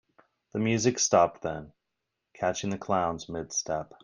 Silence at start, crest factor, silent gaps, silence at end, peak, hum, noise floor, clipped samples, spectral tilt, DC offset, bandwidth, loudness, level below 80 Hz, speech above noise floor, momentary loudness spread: 0.55 s; 22 dB; none; 0.2 s; -8 dBFS; none; -84 dBFS; under 0.1%; -4 dB/octave; under 0.1%; 11 kHz; -28 LUFS; -62 dBFS; 56 dB; 13 LU